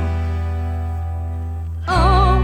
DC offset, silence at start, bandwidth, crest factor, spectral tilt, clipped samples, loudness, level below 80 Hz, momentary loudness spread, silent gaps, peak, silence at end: under 0.1%; 0 s; 9.4 kHz; 16 dB; -7 dB/octave; under 0.1%; -20 LUFS; -22 dBFS; 12 LU; none; -2 dBFS; 0 s